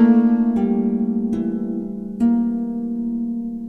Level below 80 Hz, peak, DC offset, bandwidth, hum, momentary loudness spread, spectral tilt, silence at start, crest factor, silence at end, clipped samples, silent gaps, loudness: -48 dBFS; -4 dBFS; under 0.1%; 3 kHz; none; 9 LU; -10 dB/octave; 0 s; 14 dB; 0 s; under 0.1%; none; -20 LUFS